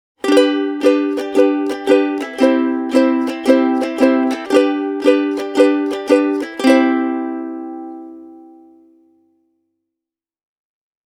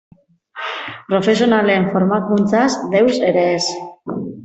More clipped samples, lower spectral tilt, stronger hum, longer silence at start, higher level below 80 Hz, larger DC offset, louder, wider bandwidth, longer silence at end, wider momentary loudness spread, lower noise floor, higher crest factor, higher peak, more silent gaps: neither; second, -4 dB/octave vs -5.5 dB/octave; neither; second, 0.25 s vs 0.55 s; about the same, -62 dBFS vs -58 dBFS; neither; about the same, -15 LUFS vs -16 LUFS; first, 14 kHz vs 8.2 kHz; first, 2.7 s vs 0 s; about the same, 11 LU vs 13 LU; first, -87 dBFS vs -37 dBFS; about the same, 16 dB vs 14 dB; about the same, 0 dBFS vs -2 dBFS; neither